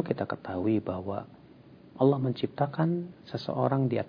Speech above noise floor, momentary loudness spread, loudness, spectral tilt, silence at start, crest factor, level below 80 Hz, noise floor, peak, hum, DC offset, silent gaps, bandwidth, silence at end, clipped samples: 24 dB; 12 LU; -30 LUFS; -10 dB/octave; 0 s; 18 dB; -66 dBFS; -53 dBFS; -10 dBFS; none; under 0.1%; none; 5.4 kHz; 0 s; under 0.1%